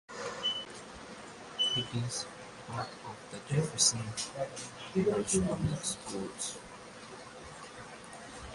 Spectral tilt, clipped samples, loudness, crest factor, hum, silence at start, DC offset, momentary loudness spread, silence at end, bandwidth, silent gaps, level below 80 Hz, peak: -3 dB/octave; under 0.1%; -33 LUFS; 24 dB; none; 0.1 s; under 0.1%; 18 LU; 0 s; 11.5 kHz; none; -58 dBFS; -12 dBFS